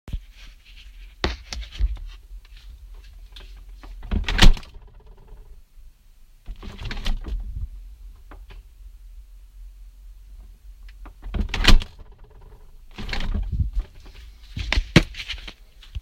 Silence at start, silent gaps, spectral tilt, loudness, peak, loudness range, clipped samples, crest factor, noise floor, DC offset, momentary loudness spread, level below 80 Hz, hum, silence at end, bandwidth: 0.05 s; none; -4.5 dB/octave; -25 LUFS; 0 dBFS; 13 LU; under 0.1%; 24 dB; -50 dBFS; under 0.1%; 29 LU; -26 dBFS; none; 0 s; 14.5 kHz